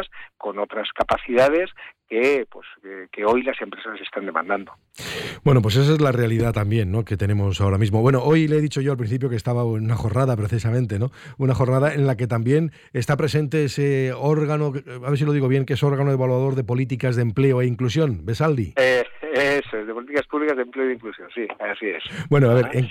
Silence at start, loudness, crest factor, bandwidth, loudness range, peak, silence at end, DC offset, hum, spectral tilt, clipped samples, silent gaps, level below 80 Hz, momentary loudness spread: 0 s; -21 LUFS; 14 dB; 14 kHz; 3 LU; -6 dBFS; 0 s; under 0.1%; none; -7 dB/octave; under 0.1%; none; -48 dBFS; 12 LU